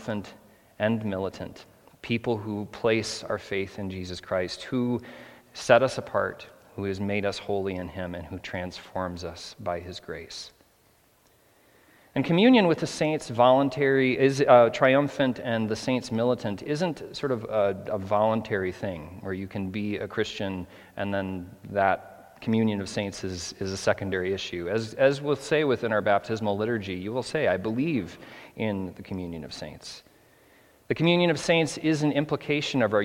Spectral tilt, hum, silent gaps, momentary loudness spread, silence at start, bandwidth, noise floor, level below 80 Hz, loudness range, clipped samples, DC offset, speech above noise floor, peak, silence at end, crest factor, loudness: -5.5 dB/octave; none; none; 16 LU; 0 s; 16.5 kHz; -62 dBFS; -62 dBFS; 10 LU; under 0.1%; under 0.1%; 36 dB; -2 dBFS; 0 s; 24 dB; -26 LUFS